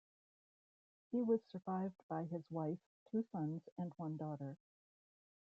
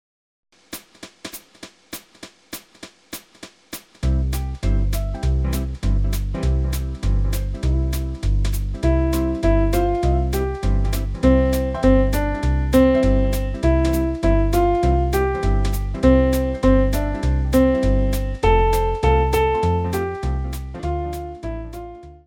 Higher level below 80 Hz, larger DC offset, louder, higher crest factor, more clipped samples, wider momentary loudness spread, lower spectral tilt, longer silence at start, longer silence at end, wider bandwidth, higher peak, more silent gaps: second, -86 dBFS vs -22 dBFS; neither; second, -44 LUFS vs -20 LUFS; about the same, 20 dB vs 16 dB; neither; second, 10 LU vs 18 LU; first, -10 dB/octave vs -7 dB/octave; first, 1.1 s vs 0.7 s; first, 1.05 s vs 0.1 s; second, 5.6 kHz vs 17.5 kHz; second, -26 dBFS vs -2 dBFS; first, 2.03-2.09 s, 2.86-3.06 s, 3.72-3.76 s vs none